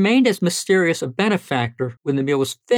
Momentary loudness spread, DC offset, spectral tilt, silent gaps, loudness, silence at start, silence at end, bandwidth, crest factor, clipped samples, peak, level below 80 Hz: 7 LU; under 0.1%; -5 dB/octave; none; -20 LUFS; 0 s; 0 s; 17 kHz; 14 dB; under 0.1%; -4 dBFS; -66 dBFS